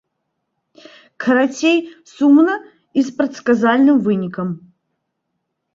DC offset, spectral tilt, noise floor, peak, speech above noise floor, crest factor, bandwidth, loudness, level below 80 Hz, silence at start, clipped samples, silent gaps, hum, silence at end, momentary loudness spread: under 0.1%; -6 dB/octave; -74 dBFS; -2 dBFS; 59 dB; 16 dB; 7.6 kHz; -16 LUFS; -64 dBFS; 1.2 s; under 0.1%; none; none; 1.2 s; 13 LU